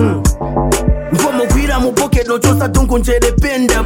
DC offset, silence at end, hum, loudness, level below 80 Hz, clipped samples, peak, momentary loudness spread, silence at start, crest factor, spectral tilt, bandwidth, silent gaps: under 0.1%; 0 s; none; -13 LUFS; -18 dBFS; under 0.1%; 0 dBFS; 3 LU; 0 s; 12 dB; -5.5 dB/octave; 17 kHz; none